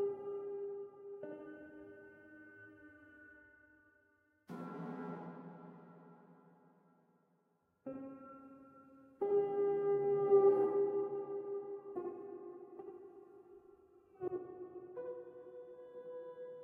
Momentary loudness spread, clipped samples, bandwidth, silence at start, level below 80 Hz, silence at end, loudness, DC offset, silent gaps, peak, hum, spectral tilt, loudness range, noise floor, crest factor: 25 LU; under 0.1%; 3 kHz; 0 s; -86 dBFS; 0 s; -38 LUFS; under 0.1%; none; -20 dBFS; none; -9.5 dB/octave; 21 LU; -78 dBFS; 22 dB